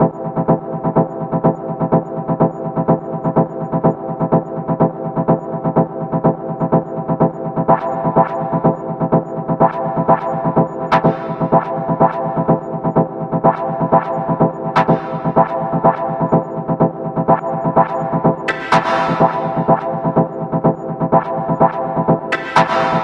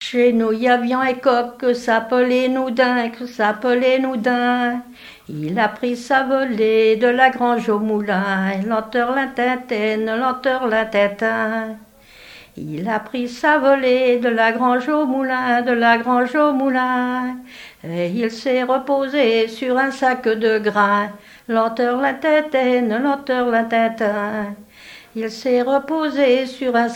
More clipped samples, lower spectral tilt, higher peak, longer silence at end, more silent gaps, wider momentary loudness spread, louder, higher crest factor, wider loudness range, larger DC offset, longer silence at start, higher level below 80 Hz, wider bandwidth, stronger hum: neither; first, -8.5 dB/octave vs -5.5 dB/octave; about the same, 0 dBFS vs 0 dBFS; about the same, 0 s vs 0 s; neither; second, 5 LU vs 9 LU; about the same, -17 LUFS vs -18 LUFS; about the same, 16 dB vs 18 dB; about the same, 2 LU vs 3 LU; neither; about the same, 0 s vs 0 s; first, -46 dBFS vs -60 dBFS; second, 7.8 kHz vs 16 kHz; neither